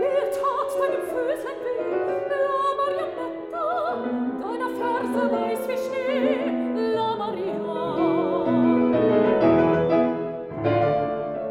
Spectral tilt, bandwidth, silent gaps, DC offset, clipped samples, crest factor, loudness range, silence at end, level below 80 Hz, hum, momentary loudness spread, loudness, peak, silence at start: -7 dB/octave; 16 kHz; none; under 0.1%; under 0.1%; 14 dB; 5 LU; 0 s; -60 dBFS; none; 9 LU; -24 LUFS; -8 dBFS; 0 s